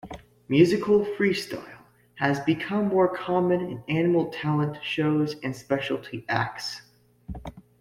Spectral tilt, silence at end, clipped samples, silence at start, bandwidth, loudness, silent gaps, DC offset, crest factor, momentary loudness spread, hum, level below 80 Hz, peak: -6.5 dB/octave; 0.2 s; under 0.1%; 0.05 s; 15 kHz; -25 LUFS; none; under 0.1%; 20 dB; 18 LU; none; -56 dBFS; -6 dBFS